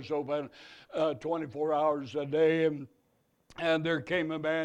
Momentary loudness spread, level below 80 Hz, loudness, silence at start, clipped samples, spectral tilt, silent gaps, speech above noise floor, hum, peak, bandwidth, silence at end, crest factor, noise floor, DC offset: 16 LU; -70 dBFS; -31 LUFS; 0 s; under 0.1%; -6.5 dB/octave; none; 42 dB; none; -16 dBFS; 8.8 kHz; 0 s; 16 dB; -72 dBFS; under 0.1%